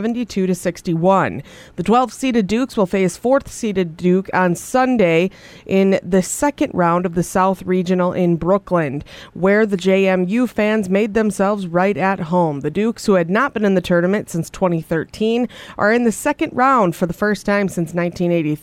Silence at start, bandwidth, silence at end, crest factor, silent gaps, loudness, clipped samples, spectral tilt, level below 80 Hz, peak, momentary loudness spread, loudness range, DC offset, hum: 0 s; 15.5 kHz; 0.05 s; 14 dB; none; -17 LUFS; under 0.1%; -6 dB/octave; -48 dBFS; -2 dBFS; 6 LU; 1 LU; under 0.1%; none